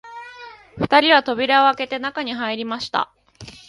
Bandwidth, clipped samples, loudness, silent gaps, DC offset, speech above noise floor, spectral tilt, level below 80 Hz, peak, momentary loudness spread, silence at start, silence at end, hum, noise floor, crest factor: 11.5 kHz; under 0.1%; -18 LUFS; none; under 0.1%; 23 dB; -4.5 dB/octave; -56 dBFS; 0 dBFS; 23 LU; 0.05 s; 0.15 s; none; -42 dBFS; 20 dB